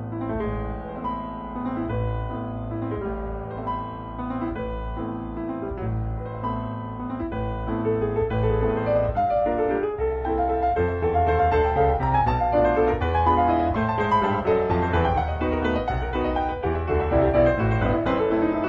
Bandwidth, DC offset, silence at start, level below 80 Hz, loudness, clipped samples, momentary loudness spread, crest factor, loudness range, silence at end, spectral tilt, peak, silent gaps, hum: 7 kHz; under 0.1%; 0 s; -34 dBFS; -24 LUFS; under 0.1%; 10 LU; 16 dB; 9 LU; 0 s; -9.5 dB/octave; -6 dBFS; none; none